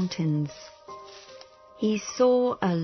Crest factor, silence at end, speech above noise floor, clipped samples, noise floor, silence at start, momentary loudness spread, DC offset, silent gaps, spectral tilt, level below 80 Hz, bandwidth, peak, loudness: 16 dB; 0 s; 24 dB; under 0.1%; -49 dBFS; 0 s; 23 LU; under 0.1%; none; -6.5 dB/octave; -66 dBFS; 6.4 kHz; -12 dBFS; -26 LUFS